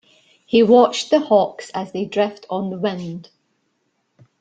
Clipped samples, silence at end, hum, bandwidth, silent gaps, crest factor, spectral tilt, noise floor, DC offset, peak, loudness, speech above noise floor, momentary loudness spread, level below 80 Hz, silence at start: under 0.1%; 1.2 s; none; 9.2 kHz; none; 18 dB; -5.5 dB/octave; -69 dBFS; under 0.1%; -2 dBFS; -18 LUFS; 51 dB; 16 LU; -64 dBFS; 0.5 s